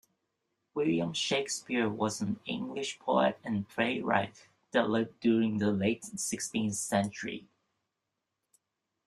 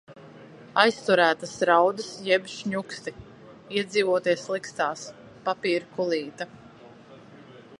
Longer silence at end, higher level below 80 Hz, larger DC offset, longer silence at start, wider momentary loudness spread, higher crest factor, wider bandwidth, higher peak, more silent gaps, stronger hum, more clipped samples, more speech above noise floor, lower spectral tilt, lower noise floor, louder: first, 1.6 s vs 0.05 s; about the same, -70 dBFS vs -66 dBFS; neither; first, 0.75 s vs 0.1 s; second, 8 LU vs 16 LU; about the same, 22 dB vs 24 dB; first, 13 kHz vs 11.5 kHz; second, -10 dBFS vs -2 dBFS; neither; neither; neither; first, 54 dB vs 24 dB; about the same, -4 dB/octave vs -4 dB/octave; first, -86 dBFS vs -49 dBFS; second, -31 LUFS vs -25 LUFS